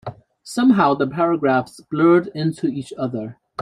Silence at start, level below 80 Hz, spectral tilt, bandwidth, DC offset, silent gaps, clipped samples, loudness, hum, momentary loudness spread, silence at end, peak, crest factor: 0.05 s; -60 dBFS; -7 dB/octave; 11.5 kHz; under 0.1%; none; under 0.1%; -19 LUFS; none; 13 LU; 0 s; -2 dBFS; 16 dB